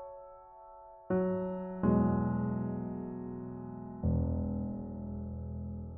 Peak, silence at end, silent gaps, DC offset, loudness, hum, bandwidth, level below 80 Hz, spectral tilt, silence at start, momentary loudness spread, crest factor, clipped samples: -16 dBFS; 0 s; none; under 0.1%; -35 LUFS; none; 3 kHz; -48 dBFS; -8.5 dB/octave; 0 s; 21 LU; 18 dB; under 0.1%